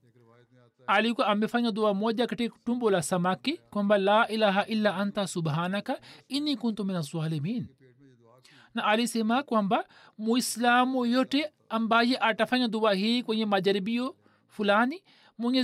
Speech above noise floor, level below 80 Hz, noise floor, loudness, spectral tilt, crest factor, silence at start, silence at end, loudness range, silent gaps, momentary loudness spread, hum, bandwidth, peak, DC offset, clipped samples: 33 dB; -74 dBFS; -60 dBFS; -27 LUFS; -5 dB/octave; 16 dB; 0.9 s; 0 s; 5 LU; none; 9 LU; none; 14.5 kHz; -12 dBFS; under 0.1%; under 0.1%